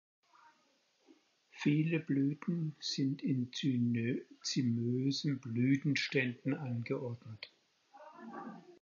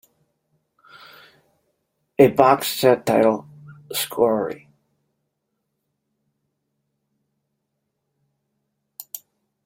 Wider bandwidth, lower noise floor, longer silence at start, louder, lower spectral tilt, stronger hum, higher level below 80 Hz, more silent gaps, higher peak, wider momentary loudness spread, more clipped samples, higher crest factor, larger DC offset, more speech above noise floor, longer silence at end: second, 7.4 kHz vs 16.5 kHz; about the same, -74 dBFS vs -77 dBFS; second, 1.55 s vs 2.2 s; second, -35 LUFS vs -19 LUFS; about the same, -6 dB/octave vs -5 dB/octave; neither; second, -80 dBFS vs -64 dBFS; neither; second, -18 dBFS vs 0 dBFS; second, 16 LU vs 21 LU; neither; about the same, 20 dB vs 24 dB; neither; second, 39 dB vs 59 dB; second, 0.1 s vs 0.5 s